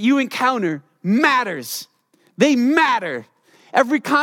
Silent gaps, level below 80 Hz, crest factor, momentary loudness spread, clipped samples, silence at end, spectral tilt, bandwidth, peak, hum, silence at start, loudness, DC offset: none; -72 dBFS; 18 dB; 12 LU; under 0.1%; 0 s; -4.5 dB/octave; 17.5 kHz; -2 dBFS; none; 0 s; -18 LUFS; under 0.1%